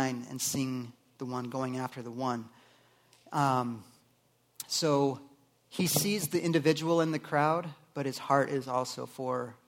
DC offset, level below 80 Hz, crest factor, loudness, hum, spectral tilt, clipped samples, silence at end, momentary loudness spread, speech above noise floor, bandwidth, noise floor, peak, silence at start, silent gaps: under 0.1%; -74 dBFS; 22 dB; -31 LUFS; none; -4.5 dB/octave; under 0.1%; 0.1 s; 12 LU; 38 dB; 17.5 kHz; -69 dBFS; -10 dBFS; 0 s; none